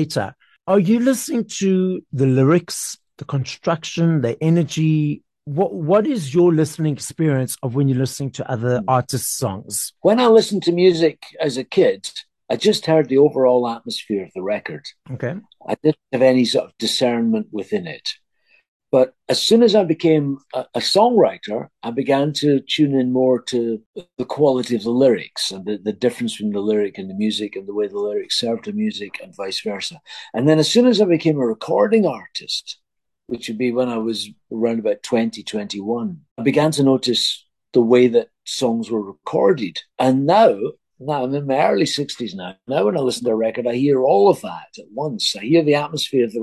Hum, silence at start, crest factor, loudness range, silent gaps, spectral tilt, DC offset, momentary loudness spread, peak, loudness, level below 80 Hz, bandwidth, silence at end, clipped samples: none; 0 s; 16 dB; 4 LU; 18.68-18.80 s, 23.86-23.94 s, 36.31-36.36 s; -5.5 dB/octave; under 0.1%; 13 LU; -2 dBFS; -19 LUFS; -62 dBFS; 12.5 kHz; 0 s; under 0.1%